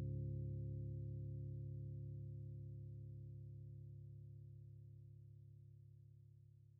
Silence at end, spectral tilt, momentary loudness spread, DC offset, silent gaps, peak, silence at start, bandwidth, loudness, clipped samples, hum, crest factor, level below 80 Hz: 0 s; -13 dB/octave; 16 LU; under 0.1%; none; -38 dBFS; 0 s; 0.6 kHz; -52 LUFS; under 0.1%; 60 Hz at -85 dBFS; 14 dB; -62 dBFS